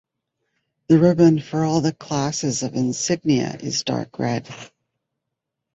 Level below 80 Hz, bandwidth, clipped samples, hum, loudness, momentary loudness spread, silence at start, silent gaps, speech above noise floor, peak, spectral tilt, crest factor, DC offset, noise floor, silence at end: -58 dBFS; 8.2 kHz; under 0.1%; none; -20 LUFS; 9 LU; 0.9 s; none; 62 dB; -4 dBFS; -5.5 dB/octave; 18 dB; under 0.1%; -81 dBFS; 1.1 s